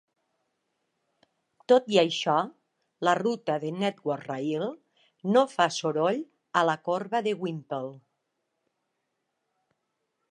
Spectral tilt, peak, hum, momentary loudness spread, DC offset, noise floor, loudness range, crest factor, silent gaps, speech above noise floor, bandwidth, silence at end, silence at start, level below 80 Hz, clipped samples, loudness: -5 dB/octave; -6 dBFS; none; 11 LU; under 0.1%; -80 dBFS; 5 LU; 22 dB; none; 54 dB; 10 kHz; 2.35 s; 1.7 s; -82 dBFS; under 0.1%; -27 LUFS